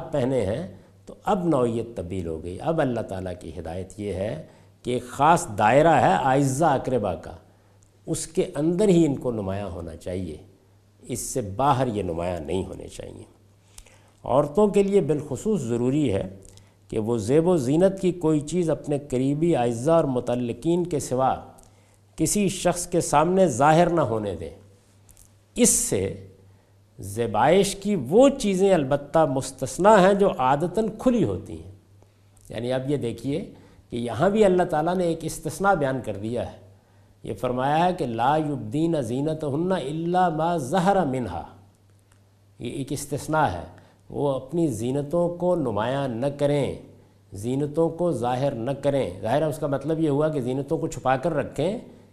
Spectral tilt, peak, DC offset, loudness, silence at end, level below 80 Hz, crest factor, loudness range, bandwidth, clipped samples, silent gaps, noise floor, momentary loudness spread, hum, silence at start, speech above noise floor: -5.5 dB/octave; -2 dBFS; under 0.1%; -23 LUFS; 0.2 s; -50 dBFS; 22 dB; 6 LU; 14.5 kHz; under 0.1%; none; -57 dBFS; 15 LU; none; 0 s; 34 dB